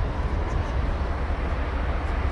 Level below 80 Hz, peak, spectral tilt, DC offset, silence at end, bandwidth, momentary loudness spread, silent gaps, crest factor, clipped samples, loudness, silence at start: -26 dBFS; -14 dBFS; -7.5 dB/octave; under 0.1%; 0 s; 7.2 kHz; 1 LU; none; 12 dB; under 0.1%; -28 LUFS; 0 s